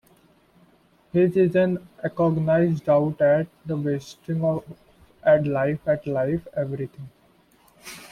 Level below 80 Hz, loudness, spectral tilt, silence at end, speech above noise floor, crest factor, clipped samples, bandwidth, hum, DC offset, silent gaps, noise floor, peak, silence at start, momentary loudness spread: -58 dBFS; -23 LUFS; -8.5 dB/octave; 0.05 s; 36 dB; 16 dB; under 0.1%; 14 kHz; none; under 0.1%; none; -59 dBFS; -8 dBFS; 1.15 s; 12 LU